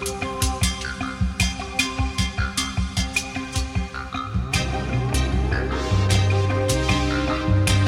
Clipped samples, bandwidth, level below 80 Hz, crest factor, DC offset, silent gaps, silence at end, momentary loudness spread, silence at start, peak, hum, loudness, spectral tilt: under 0.1%; 16 kHz; -28 dBFS; 16 dB; under 0.1%; none; 0 s; 7 LU; 0 s; -6 dBFS; none; -23 LUFS; -4.5 dB/octave